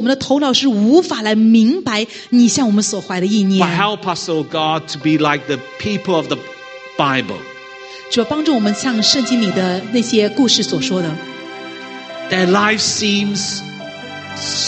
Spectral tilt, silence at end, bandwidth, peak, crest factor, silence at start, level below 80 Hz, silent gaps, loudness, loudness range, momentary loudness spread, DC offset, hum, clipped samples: -4 dB/octave; 0 s; 9 kHz; 0 dBFS; 16 dB; 0 s; -58 dBFS; none; -15 LUFS; 5 LU; 17 LU; under 0.1%; none; under 0.1%